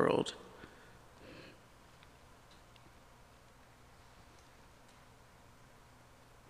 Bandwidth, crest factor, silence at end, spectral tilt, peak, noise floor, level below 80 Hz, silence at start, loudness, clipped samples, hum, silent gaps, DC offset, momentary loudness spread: 15.5 kHz; 28 dB; 4.95 s; -5 dB/octave; -16 dBFS; -61 dBFS; -68 dBFS; 0 s; -42 LUFS; under 0.1%; 60 Hz at -70 dBFS; none; under 0.1%; 9 LU